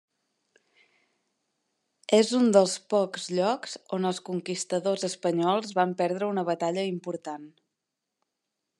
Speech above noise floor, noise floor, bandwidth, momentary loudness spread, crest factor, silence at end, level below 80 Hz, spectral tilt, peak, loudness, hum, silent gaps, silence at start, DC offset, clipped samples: 58 dB; -85 dBFS; 12 kHz; 13 LU; 22 dB; 1.3 s; -86 dBFS; -4.5 dB/octave; -6 dBFS; -27 LUFS; none; none; 2.1 s; under 0.1%; under 0.1%